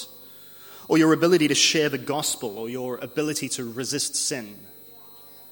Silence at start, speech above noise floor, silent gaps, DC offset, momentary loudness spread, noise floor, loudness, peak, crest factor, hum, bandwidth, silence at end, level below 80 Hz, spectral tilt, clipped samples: 0 s; 23 dB; none; under 0.1%; 25 LU; -46 dBFS; -23 LUFS; -6 dBFS; 18 dB; 50 Hz at -55 dBFS; 17 kHz; 0 s; -68 dBFS; -3 dB/octave; under 0.1%